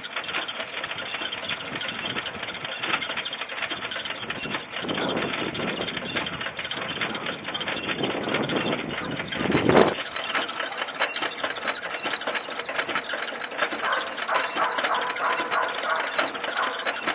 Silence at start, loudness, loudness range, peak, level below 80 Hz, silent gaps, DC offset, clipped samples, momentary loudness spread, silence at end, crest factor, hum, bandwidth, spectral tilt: 0 s; -27 LUFS; 4 LU; -2 dBFS; -58 dBFS; none; under 0.1%; under 0.1%; 6 LU; 0 s; 26 dB; none; 4 kHz; -1.5 dB/octave